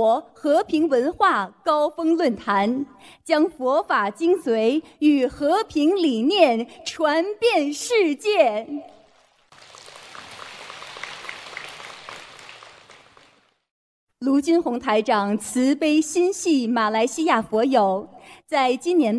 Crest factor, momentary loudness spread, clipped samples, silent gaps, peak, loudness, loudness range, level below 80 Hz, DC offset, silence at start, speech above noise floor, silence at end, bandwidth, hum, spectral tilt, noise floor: 18 dB; 18 LU; under 0.1%; 13.71-14.07 s; -4 dBFS; -21 LUFS; 17 LU; -62 dBFS; under 0.1%; 0 s; 38 dB; 0 s; 11 kHz; none; -4 dB/octave; -58 dBFS